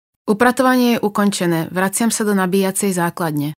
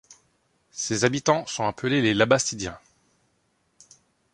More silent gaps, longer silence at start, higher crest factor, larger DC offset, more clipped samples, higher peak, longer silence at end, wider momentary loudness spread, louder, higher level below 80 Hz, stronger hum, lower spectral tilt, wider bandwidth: neither; first, 0.25 s vs 0.1 s; second, 16 dB vs 24 dB; neither; neither; first, 0 dBFS vs -4 dBFS; second, 0.05 s vs 1.55 s; second, 5 LU vs 13 LU; first, -17 LUFS vs -24 LUFS; about the same, -60 dBFS vs -58 dBFS; neither; about the same, -4.5 dB/octave vs -4 dB/octave; first, 16.5 kHz vs 11.5 kHz